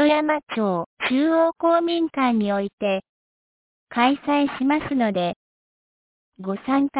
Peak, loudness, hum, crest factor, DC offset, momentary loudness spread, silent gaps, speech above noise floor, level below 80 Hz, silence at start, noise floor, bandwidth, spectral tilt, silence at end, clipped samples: -6 dBFS; -22 LUFS; none; 16 dB; under 0.1%; 9 LU; 0.86-0.97 s, 2.73-2.78 s, 3.09-3.87 s, 5.36-6.32 s; over 69 dB; -60 dBFS; 0 s; under -90 dBFS; 4 kHz; -9.5 dB/octave; 0 s; under 0.1%